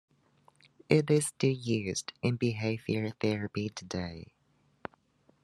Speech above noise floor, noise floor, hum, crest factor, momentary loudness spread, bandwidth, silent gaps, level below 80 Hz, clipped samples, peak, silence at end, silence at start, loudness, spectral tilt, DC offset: 36 dB; -67 dBFS; none; 24 dB; 20 LU; 12.5 kHz; none; -68 dBFS; under 0.1%; -8 dBFS; 1.2 s; 0.9 s; -31 LUFS; -5.5 dB/octave; under 0.1%